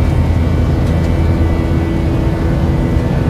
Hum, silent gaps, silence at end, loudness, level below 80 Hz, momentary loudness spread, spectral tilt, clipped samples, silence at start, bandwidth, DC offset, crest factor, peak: none; none; 0 s; -14 LUFS; -20 dBFS; 1 LU; -8.5 dB/octave; under 0.1%; 0 s; 12 kHz; under 0.1%; 12 dB; -2 dBFS